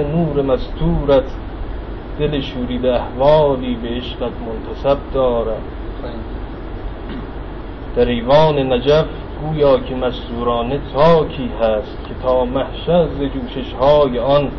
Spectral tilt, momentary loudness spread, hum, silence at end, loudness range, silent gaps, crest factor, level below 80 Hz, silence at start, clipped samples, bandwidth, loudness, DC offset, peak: -5.5 dB/octave; 16 LU; none; 0 s; 6 LU; none; 16 dB; -28 dBFS; 0 s; under 0.1%; 6.2 kHz; -17 LUFS; 0.6%; 0 dBFS